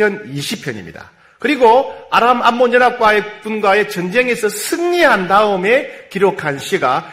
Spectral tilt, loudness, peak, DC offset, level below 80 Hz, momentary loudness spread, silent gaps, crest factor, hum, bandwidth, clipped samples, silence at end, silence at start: -4 dB/octave; -14 LUFS; 0 dBFS; under 0.1%; -52 dBFS; 12 LU; none; 14 dB; none; 16 kHz; under 0.1%; 0 s; 0 s